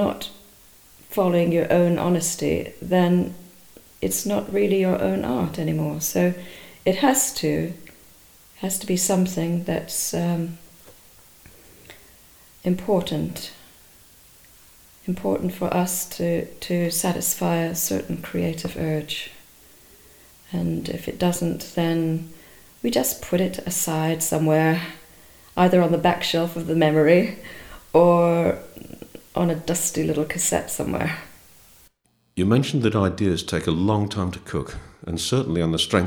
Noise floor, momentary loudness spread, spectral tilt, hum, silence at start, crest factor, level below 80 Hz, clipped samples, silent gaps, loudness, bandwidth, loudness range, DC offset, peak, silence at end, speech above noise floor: -64 dBFS; 13 LU; -5 dB/octave; none; 0 s; 20 dB; -50 dBFS; under 0.1%; none; -22 LUFS; over 20 kHz; 8 LU; under 0.1%; -4 dBFS; 0 s; 42 dB